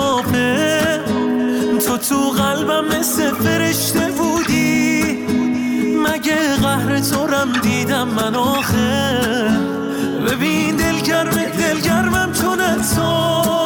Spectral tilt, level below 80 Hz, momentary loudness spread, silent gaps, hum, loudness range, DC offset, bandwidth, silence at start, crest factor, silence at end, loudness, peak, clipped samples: -4 dB/octave; -42 dBFS; 3 LU; none; none; 1 LU; under 0.1%; 19.5 kHz; 0 s; 10 dB; 0 s; -17 LUFS; -6 dBFS; under 0.1%